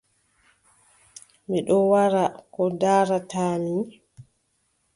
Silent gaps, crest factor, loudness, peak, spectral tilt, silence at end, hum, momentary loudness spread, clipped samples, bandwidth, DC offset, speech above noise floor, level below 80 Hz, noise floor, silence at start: none; 18 dB; -23 LUFS; -8 dBFS; -6.5 dB/octave; 0.75 s; none; 10 LU; under 0.1%; 11.5 kHz; under 0.1%; 49 dB; -66 dBFS; -71 dBFS; 1.5 s